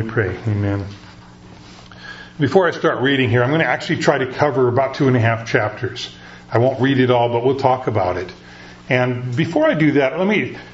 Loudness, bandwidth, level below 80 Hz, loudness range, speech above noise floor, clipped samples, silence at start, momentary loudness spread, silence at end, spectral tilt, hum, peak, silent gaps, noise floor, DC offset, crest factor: -18 LUFS; 8 kHz; -50 dBFS; 3 LU; 24 dB; under 0.1%; 0 s; 15 LU; 0 s; -7 dB/octave; 60 Hz at -40 dBFS; 0 dBFS; none; -41 dBFS; under 0.1%; 18 dB